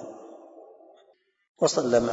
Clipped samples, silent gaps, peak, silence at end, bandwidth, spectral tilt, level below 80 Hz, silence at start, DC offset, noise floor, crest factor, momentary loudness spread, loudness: under 0.1%; 1.49-1.55 s; -10 dBFS; 0 s; 8 kHz; -4 dB/octave; -60 dBFS; 0 s; under 0.1%; -63 dBFS; 20 dB; 26 LU; -24 LUFS